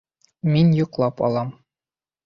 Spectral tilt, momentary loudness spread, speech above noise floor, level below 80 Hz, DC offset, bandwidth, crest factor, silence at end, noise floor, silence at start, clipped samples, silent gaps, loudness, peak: -9.5 dB/octave; 10 LU; over 71 dB; -56 dBFS; under 0.1%; 6.2 kHz; 16 dB; 0.75 s; under -90 dBFS; 0.45 s; under 0.1%; none; -20 LUFS; -6 dBFS